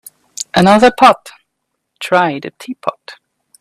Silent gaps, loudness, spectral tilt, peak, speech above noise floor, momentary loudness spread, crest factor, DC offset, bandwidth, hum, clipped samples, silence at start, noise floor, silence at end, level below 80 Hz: none; -12 LUFS; -5 dB/octave; 0 dBFS; 60 dB; 19 LU; 14 dB; under 0.1%; 15 kHz; none; under 0.1%; 0.4 s; -72 dBFS; 0.45 s; -52 dBFS